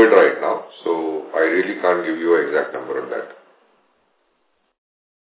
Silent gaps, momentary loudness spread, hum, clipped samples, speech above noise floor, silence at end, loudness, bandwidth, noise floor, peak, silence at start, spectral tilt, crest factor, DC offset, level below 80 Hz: none; 11 LU; none; under 0.1%; 46 dB; 1.9 s; -19 LUFS; 4 kHz; -67 dBFS; 0 dBFS; 0 s; -8.5 dB/octave; 20 dB; under 0.1%; -82 dBFS